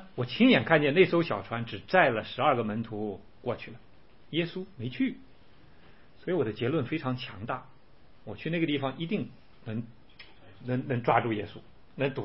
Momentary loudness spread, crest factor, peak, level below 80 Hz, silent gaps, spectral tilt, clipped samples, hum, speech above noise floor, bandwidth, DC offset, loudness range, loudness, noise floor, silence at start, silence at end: 19 LU; 22 dB; -8 dBFS; -62 dBFS; none; -10 dB/octave; under 0.1%; none; 31 dB; 5.8 kHz; 0.3%; 9 LU; -29 LUFS; -59 dBFS; 0 s; 0 s